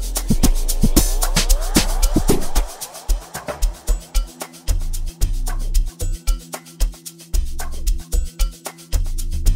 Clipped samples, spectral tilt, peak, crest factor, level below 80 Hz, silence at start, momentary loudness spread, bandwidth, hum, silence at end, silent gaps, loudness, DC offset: under 0.1%; -4 dB/octave; 0 dBFS; 18 dB; -20 dBFS; 0 s; 11 LU; 16.5 kHz; none; 0 s; none; -23 LUFS; under 0.1%